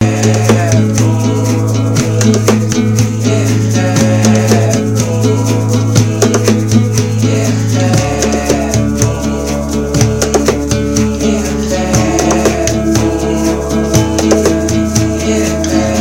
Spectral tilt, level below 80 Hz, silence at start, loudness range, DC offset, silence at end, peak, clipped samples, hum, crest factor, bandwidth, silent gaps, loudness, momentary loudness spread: -5.5 dB/octave; -26 dBFS; 0 s; 2 LU; 1%; 0 s; 0 dBFS; under 0.1%; none; 10 dB; 16.5 kHz; none; -11 LUFS; 3 LU